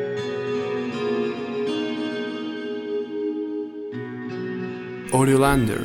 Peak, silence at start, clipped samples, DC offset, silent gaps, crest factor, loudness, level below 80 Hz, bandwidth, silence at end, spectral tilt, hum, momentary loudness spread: -4 dBFS; 0 s; under 0.1%; under 0.1%; none; 20 dB; -25 LUFS; -44 dBFS; 16 kHz; 0 s; -6 dB/octave; none; 13 LU